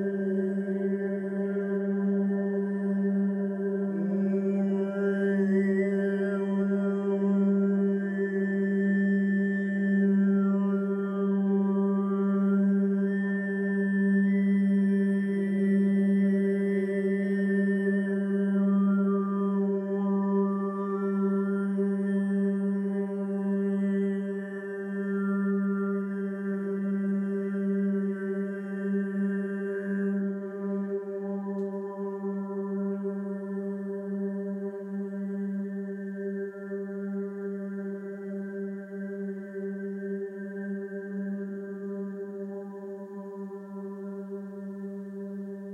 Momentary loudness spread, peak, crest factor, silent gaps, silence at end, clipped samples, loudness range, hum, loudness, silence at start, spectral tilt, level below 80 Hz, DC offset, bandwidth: 12 LU; -16 dBFS; 12 dB; none; 0 s; under 0.1%; 10 LU; none; -29 LUFS; 0 s; -10.5 dB/octave; -84 dBFS; under 0.1%; 3.4 kHz